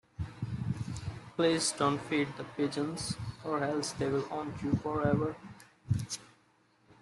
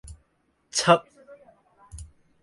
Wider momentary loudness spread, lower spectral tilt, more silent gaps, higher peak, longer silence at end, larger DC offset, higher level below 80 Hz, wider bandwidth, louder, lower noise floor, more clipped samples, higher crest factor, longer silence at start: second, 11 LU vs 25 LU; first, -5 dB/octave vs -3.5 dB/octave; neither; second, -14 dBFS vs -6 dBFS; second, 0.1 s vs 0.4 s; neither; second, -58 dBFS vs -52 dBFS; about the same, 12.5 kHz vs 11.5 kHz; second, -34 LUFS vs -22 LUFS; about the same, -68 dBFS vs -70 dBFS; neither; about the same, 20 dB vs 24 dB; about the same, 0.2 s vs 0.1 s